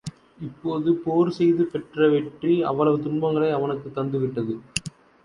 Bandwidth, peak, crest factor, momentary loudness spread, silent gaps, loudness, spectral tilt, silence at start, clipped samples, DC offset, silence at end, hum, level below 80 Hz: 11.5 kHz; -6 dBFS; 18 dB; 10 LU; none; -23 LUFS; -6.5 dB/octave; 0.05 s; under 0.1%; under 0.1%; 0.35 s; none; -58 dBFS